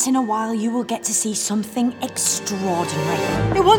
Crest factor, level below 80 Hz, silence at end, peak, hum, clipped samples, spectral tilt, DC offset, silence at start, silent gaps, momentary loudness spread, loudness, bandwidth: 18 dB; -44 dBFS; 0 s; -2 dBFS; none; under 0.1%; -4 dB/octave; under 0.1%; 0 s; none; 3 LU; -21 LUFS; 19.5 kHz